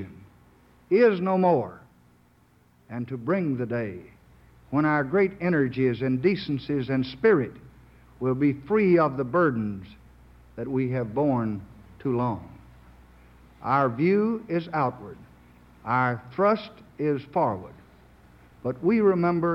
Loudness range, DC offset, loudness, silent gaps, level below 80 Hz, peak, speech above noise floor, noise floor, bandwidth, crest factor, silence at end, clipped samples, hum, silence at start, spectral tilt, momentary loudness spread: 5 LU; under 0.1%; -25 LUFS; none; -56 dBFS; -10 dBFS; 36 dB; -60 dBFS; 5.8 kHz; 18 dB; 0 s; under 0.1%; none; 0 s; -9.5 dB/octave; 16 LU